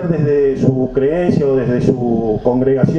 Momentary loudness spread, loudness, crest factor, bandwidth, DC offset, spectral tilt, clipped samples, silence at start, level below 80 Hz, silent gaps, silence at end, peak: 2 LU; -15 LUFS; 14 dB; 7.2 kHz; under 0.1%; -9.5 dB/octave; under 0.1%; 0 s; -38 dBFS; none; 0 s; 0 dBFS